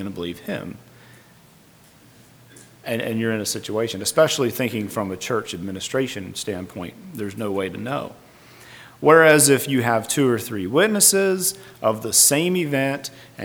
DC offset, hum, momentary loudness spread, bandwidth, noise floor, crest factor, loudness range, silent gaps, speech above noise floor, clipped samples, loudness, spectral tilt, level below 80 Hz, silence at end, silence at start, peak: under 0.1%; none; 16 LU; over 20 kHz; -51 dBFS; 22 dB; 12 LU; none; 30 dB; under 0.1%; -20 LUFS; -3 dB/octave; -62 dBFS; 0 s; 0 s; 0 dBFS